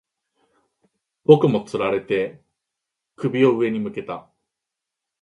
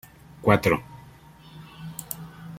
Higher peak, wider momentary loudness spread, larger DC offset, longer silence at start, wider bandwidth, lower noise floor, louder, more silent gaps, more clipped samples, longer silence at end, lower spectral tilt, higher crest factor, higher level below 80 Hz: about the same, 0 dBFS vs -2 dBFS; second, 16 LU vs 25 LU; neither; first, 1.3 s vs 0.4 s; second, 11 kHz vs 16.5 kHz; first, -84 dBFS vs -49 dBFS; first, -20 LUFS vs -25 LUFS; neither; neither; first, 1 s vs 0 s; first, -8 dB/octave vs -6 dB/octave; about the same, 22 dB vs 26 dB; second, -64 dBFS vs -52 dBFS